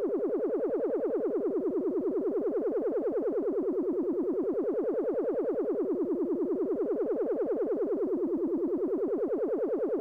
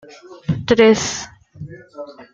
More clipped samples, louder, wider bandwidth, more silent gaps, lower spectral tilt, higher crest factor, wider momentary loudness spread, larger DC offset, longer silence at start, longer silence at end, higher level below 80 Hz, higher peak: neither; second, -30 LUFS vs -16 LUFS; second, 2.9 kHz vs 7.8 kHz; neither; first, -10 dB/octave vs -4.5 dB/octave; second, 6 dB vs 18 dB; second, 0 LU vs 24 LU; neither; second, 0 s vs 0.3 s; about the same, 0 s vs 0.1 s; second, -68 dBFS vs -48 dBFS; second, -24 dBFS vs -2 dBFS